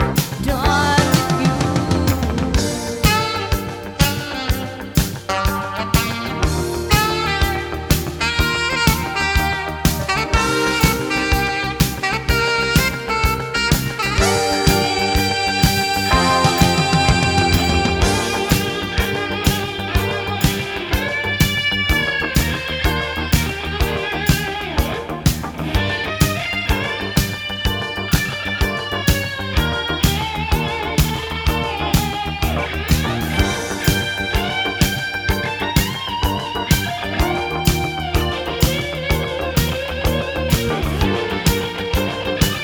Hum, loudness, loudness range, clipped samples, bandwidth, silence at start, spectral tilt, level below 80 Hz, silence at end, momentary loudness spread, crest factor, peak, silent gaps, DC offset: none; -18 LUFS; 4 LU; under 0.1%; over 20 kHz; 0 s; -4.5 dB/octave; -26 dBFS; 0 s; 6 LU; 18 dB; 0 dBFS; none; under 0.1%